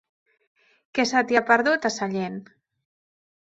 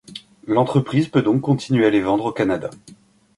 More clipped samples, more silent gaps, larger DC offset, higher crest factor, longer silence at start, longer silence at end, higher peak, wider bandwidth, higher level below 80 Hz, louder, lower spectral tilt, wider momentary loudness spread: neither; neither; neither; first, 22 dB vs 16 dB; first, 0.95 s vs 0.1 s; first, 1 s vs 0.5 s; about the same, -2 dBFS vs -4 dBFS; second, 8.2 kHz vs 11.5 kHz; second, -68 dBFS vs -56 dBFS; second, -22 LUFS vs -19 LUFS; second, -4 dB/octave vs -7.5 dB/octave; about the same, 12 LU vs 12 LU